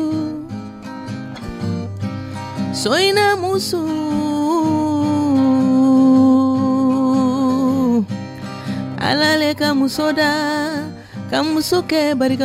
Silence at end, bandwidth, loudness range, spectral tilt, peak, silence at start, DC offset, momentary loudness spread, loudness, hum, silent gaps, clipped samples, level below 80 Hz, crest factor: 0 s; 15.5 kHz; 5 LU; -5 dB/octave; -4 dBFS; 0 s; under 0.1%; 15 LU; -17 LUFS; none; none; under 0.1%; -50 dBFS; 14 dB